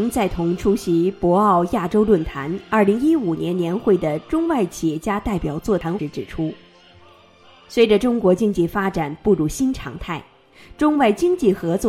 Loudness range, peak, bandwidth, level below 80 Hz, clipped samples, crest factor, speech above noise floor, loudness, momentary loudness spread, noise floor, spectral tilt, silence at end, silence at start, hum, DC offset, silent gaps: 5 LU; -4 dBFS; 15.5 kHz; -40 dBFS; under 0.1%; 16 dB; 30 dB; -20 LUFS; 10 LU; -49 dBFS; -6.5 dB/octave; 0 s; 0 s; none; under 0.1%; none